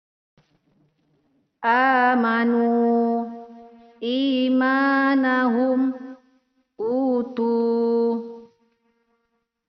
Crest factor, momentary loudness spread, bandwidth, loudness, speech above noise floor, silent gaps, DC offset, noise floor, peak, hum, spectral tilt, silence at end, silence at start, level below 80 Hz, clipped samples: 16 dB; 12 LU; 5.8 kHz; -21 LUFS; 54 dB; none; under 0.1%; -74 dBFS; -6 dBFS; none; -2.5 dB/octave; 1.25 s; 1.6 s; -72 dBFS; under 0.1%